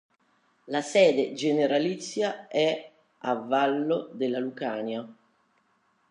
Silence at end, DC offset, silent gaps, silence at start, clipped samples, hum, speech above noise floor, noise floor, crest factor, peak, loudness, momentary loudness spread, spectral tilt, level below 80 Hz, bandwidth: 0.95 s; under 0.1%; none; 0.65 s; under 0.1%; none; 43 dB; -69 dBFS; 18 dB; -10 dBFS; -27 LUFS; 12 LU; -4.5 dB/octave; -84 dBFS; 11 kHz